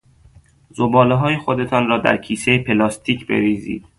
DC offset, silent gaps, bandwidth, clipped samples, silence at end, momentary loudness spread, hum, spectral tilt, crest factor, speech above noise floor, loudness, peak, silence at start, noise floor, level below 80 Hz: under 0.1%; none; 11.5 kHz; under 0.1%; 0.2 s; 8 LU; none; -6 dB/octave; 18 dB; 32 dB; -17 LUFS; 0 dBFS; 0.75 s; -49 dBFS; -48 dBFS